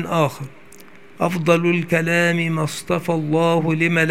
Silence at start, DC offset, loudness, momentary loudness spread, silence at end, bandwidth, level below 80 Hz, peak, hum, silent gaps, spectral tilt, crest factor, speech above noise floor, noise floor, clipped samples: 0 s; 0.6%; -19 LUFS; 7 LU; 0 s; 16 kHz; -58 dBFS; -2 dBFS; none; none; -6 dB/octave; 18 dB; 27 dB; -45 dBFS; under 0.1%